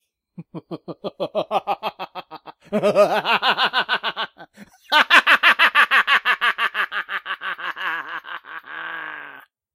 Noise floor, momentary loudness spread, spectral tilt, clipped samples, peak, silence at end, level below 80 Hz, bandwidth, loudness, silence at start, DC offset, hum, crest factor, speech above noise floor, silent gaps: -45 dBFS; 21 LU; -2.5 dB/octave; under 0.1%; 0 dBFS; 0.35 s; -70 dBFS; 16.5 kHz; -18 LUFS; 0.4 s; under 0.1%; none; 22 dB; 24 dB; none